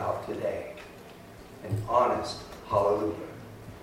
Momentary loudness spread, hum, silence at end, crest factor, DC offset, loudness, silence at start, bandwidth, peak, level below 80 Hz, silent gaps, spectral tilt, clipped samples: 22 LU; none; 0 s; 20 dB; under 0.1%; -29 LUFS; 0 s; 16 kHz; -10 dBFS; -54 dBFS; none; -6.5 dB/octave; under 0.1%